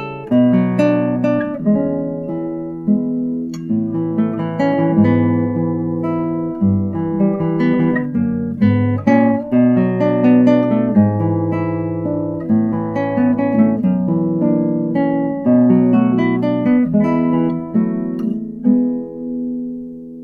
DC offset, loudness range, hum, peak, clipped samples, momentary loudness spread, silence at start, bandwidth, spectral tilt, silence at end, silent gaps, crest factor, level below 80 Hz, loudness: under 0.1%; 4 LU; none; 0 dBFS; under 0.1%; 8 LU; 0 s; 4.8 kHz; -10 dB/octave; 0 s; none; 16 dB; -52 dBFS; -16 LUFS